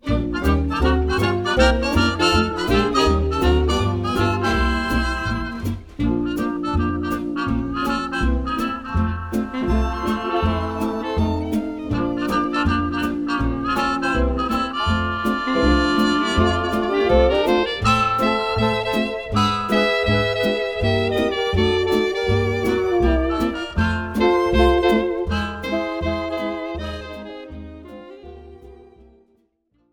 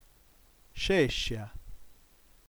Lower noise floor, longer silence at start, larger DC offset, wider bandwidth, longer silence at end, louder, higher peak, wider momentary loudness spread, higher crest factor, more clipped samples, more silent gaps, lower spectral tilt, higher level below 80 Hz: first, -65 dBFS vs -61 dBFS; second, 0.05 s vs 0.75 s; neither; about the same, 19.5 kHz vs over 20 kHz; first, 1.1 s vs 0.6 s; first, -20 LUFS vs -30 LUFS; first, -2 dBFS vs -14 dBFS; second, 8 LU vs 24 LU; about the same, 18 dB vs 20 dB; neither; neither; first, -6 dB/octave vs -4.5 dB/octave; first, -28 dBFS vs -46 dBFS